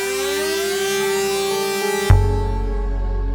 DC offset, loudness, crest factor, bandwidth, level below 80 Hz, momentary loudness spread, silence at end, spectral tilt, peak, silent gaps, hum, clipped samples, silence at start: under 0.1%; -20 LUFS; 18 dB; 19.5 kHz; -24 dBFS; 8 LU; 0 s; -4.5 dB/octave; 0 dBFS; none; none; under 0.1%; 0 s